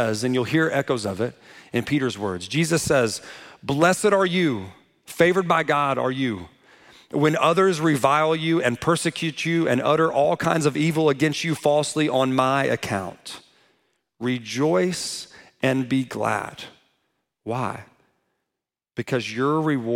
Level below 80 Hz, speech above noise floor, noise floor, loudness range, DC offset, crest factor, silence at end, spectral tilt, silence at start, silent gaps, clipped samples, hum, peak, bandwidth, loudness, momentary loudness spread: -60 dBFS; 63 dB; -85 dBFS; 7 LU; under 0.1%; 20 dB; 0 s; -5 dB/octave; 0 s; none; under 0.1%; none; -4 dBFS; 16.5 kHz; -22 LUFS; 14 LU